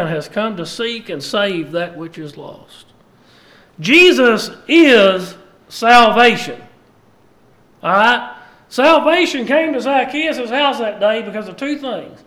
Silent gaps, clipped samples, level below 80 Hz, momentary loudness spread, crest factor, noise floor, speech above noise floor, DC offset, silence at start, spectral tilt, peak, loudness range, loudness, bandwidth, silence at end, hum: none; under 0.1%; -54 dBFS; 19 LU; 16 dB; -51 dBFS; 37 dB; under 0.1%; 0 s; -4 dB/octave; 0 dBFS; 10 LU; -14 LUFS; 15 kHz; 0.15 s; none